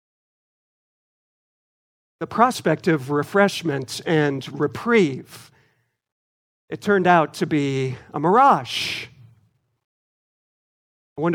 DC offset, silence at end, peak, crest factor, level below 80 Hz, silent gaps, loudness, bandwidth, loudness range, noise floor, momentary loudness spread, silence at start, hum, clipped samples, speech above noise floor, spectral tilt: under 0.1%; 0 s; -2 dBFS; 22 dB; -66 dBFS; 6.12-6.68 s, 9.84-11.16 s; -20 LUFS; 17 kHz; 4 LU; -66 dBFS; 13 LU; 2.2 s; none; under 0.1%; 46 dB; -5.5 dB/octave